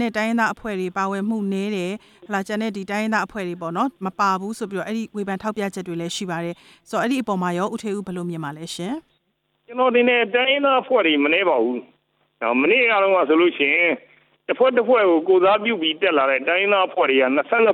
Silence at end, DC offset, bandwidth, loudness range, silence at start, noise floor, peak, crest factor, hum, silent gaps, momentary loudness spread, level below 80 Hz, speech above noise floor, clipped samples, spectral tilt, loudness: 0 s; under 0.1%; 15 kHz; 8 LU; 0 s; -70 dBFS; -4 dBFS; 16 dB; none; none; 12 LU; -64 dBFS; 50 dB; under 0.1%; -5 dB/octave; -20 LUFS